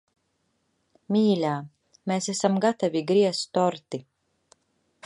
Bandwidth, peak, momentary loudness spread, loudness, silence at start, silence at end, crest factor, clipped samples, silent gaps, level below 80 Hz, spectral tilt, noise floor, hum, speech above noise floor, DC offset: 11.5 kHz; -6 dBFS; 14 LU; -25 LUFS; 1.1 s; 1.05 s; 20 dB; under 0.1%; none; -76 dBFS; -5.5 dB/octave; -73 dBFS; none; 49 dB; under 0.1%